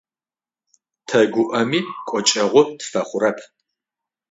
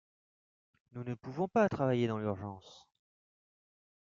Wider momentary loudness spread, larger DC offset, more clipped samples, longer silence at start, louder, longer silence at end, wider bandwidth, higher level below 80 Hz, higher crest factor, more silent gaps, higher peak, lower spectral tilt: second, 9 LU vs 16 LU; neither; neither; first, 1.1 s vs 0.95 s; first, -19 LUFS vs -34 LUFS; second, 0.85 s vs 1.35 s; about the same, 8 kHz vs 7.4 kHz; about the same, -68 dBFS vs -72 dBFS; about the same, 20 dB vs 20 dB; neither; first, 0 dBFS vs -16 dBFS; second, -3.5 dB/octave vs -6.5 dB/octave